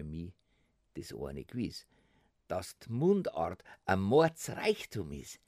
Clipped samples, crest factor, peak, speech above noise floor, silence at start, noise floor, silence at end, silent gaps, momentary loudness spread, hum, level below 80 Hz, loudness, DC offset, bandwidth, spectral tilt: under 0.1%; 20 dB; -14 dBFS; 40 dB; 0 s; -74 dBFS; 0.1 s; none; 18 LU; none; -60 dBFS; -34 LUFS; under 0.1%; 15.5 kHz; -6 dB/octave